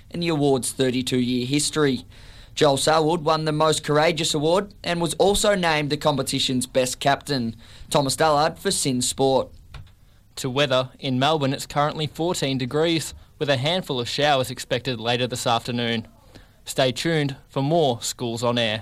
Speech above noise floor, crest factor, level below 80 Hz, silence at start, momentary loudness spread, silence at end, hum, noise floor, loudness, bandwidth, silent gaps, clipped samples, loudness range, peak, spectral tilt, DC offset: 30 dB; 16 dB; -48 dBFS; 0.15 s; 7 LU; 0 s; none; -52 dBFS; -22 LUFS; 16 kHz; none; under 0.1%; 3 LU; -6 dBFS; -4 dB/octave; under 0.1%